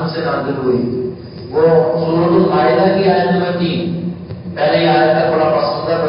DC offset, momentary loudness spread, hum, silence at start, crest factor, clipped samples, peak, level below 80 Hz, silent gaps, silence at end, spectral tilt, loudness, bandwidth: under 0.1%; 11 LU; none; 0 s; 14 dB; under 0.1%; 0 dBFS; -46 dBFS; none; 0 s; -11.5 dB/octave; -14 LUFS; 5.4 kHz